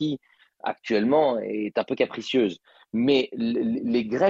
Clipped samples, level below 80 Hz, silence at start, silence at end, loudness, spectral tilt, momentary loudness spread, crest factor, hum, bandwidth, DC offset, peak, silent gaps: under 0.1%; -64 dBFS; 0 s; 0 s; -25 LUFS; -6.5 dB/octave; 11 LU; 16 dB; none; 7.6 kHz; under 0.1%; -8 dBFS; none